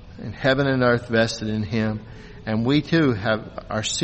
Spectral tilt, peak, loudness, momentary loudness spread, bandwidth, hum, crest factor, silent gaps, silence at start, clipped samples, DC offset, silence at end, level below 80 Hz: -5 dB/octave; -6 dBFS; -22 LUFS; 12 LU; 8.4 kHz; none; 16 dB; none; 0 s; under 0.1%; under 0.1%; 0 s; -46 dBFS